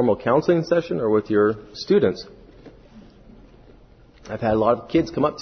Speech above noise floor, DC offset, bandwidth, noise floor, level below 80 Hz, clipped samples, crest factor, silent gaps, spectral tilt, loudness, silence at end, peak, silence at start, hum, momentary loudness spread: 29 dB; under 0.1%; 6.4 kHz; -50 dBFS; -50 dBFS; under 0.1%; 18 dB; none; -7.5 dB/octave; -21 LUFS; 0 s; -4 dBFS; 0 s; none; 11 LU